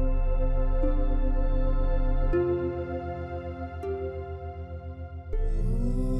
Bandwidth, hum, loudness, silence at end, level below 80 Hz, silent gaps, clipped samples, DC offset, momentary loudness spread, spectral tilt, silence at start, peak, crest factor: 3.7 kHz; none; -31 LUFS; 0 s; -26 dBFS; none; under 0.1%; under 0.1%; 11 LU; -9.5 dB/octave; 0 s; -14 dBFS; 12 dB